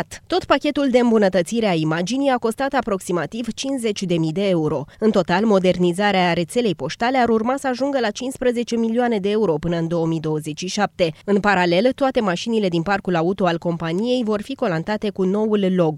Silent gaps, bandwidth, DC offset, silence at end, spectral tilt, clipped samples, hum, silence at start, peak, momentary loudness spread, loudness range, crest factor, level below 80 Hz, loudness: none; 13.5 kHz; under 0.1%; 0 s; -5.5 dB/octave; under 0.1%; none; 0 s; -2 dBFS; 6 LU; 2 LU; 16 dB; -50 dBFS; -20 LUFS